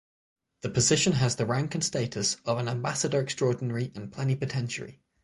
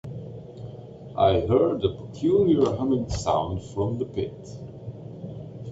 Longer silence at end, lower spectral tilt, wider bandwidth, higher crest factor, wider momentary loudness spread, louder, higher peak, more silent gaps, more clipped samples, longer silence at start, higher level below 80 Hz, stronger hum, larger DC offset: first, 0.3 s vs 0 s; second, -4 dB/octave vs -7.5 dB/octave; first, 11.5 kHz vs 8 kHz; about the same, 18 dB vs 18 dB; second, 11 LU vs 19 LU; second, -28 LUFS vs -24 LUFS; second, -12 dBFS vs -8 dBFS; neither; neither; first, 0.65 s vs 0.05 s; second, -58 dBFS vs -48 dBFS; neither; neither